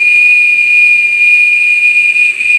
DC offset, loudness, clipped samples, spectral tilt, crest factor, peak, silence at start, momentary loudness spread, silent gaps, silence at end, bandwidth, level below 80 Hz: under 0.1%; -5 LUFS; under 0.1%; 1.5 dB/octave; 8 dB; 0 dBFS; 0 s; 2 LU; none; 0 s; 11.5 kHz; -60 dBFS